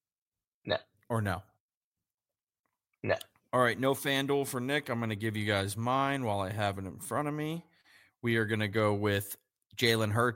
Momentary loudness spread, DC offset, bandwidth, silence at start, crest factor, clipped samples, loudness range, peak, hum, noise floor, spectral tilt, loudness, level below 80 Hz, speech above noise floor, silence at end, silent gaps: 10 LU; under 0.1%; 16.5 kHz; 0.65 s; 20 dB; under 0.1%; 4 LU; -12 dBFS; none; under -90 dBFS; -5 dB/octave; -32 LUFS; -68 dBFS; over 59 dB; 0 s; 1.60-1.93 s, 2.14-2.18 s, 2.43-2.47 s, 2.59-2.64 s, 9.66-9.70 s